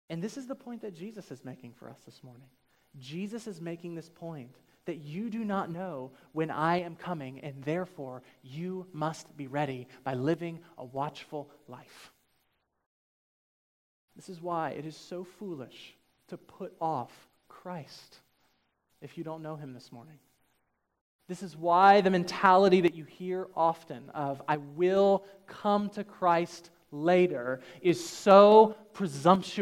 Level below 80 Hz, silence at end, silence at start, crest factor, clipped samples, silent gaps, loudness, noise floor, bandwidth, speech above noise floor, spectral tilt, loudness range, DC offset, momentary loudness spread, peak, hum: -76 dBFS; 0 s; 0.1 s; 24 dB; under 0.1%; 12.86-14.08 s, 21.01-21.19 s; -28 LUFS; -77 dBFS; 15.5 kHz; 47 dB; -6 dB/octave; 18 LU; under 0.1%; 24 LU; -6 dBFS; none